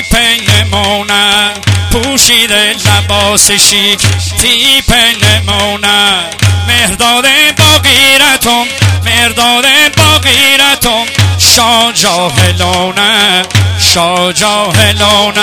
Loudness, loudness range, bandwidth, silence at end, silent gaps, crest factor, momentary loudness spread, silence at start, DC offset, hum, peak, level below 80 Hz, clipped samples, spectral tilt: -6 LUFS; 2 LU; over 20 kHz; 0 s; none; 8 dB; 6 LU; 0 s; under 0.1%; none; 0 dBFS; -28 dBFS; 3%; -2.5 dB/octave